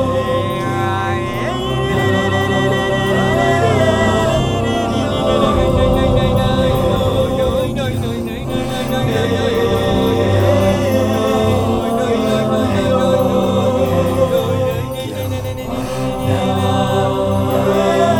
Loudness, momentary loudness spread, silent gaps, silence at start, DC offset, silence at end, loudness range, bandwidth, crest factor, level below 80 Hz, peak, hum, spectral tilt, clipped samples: -16 LUFS; 6 LU; none; 0 s; 0.5%; 0 s; 3 LU; 18 kHz; 14 dB; -30 dBFS; 0 dBFS; none; -6.5 dB/octave; under 0.1%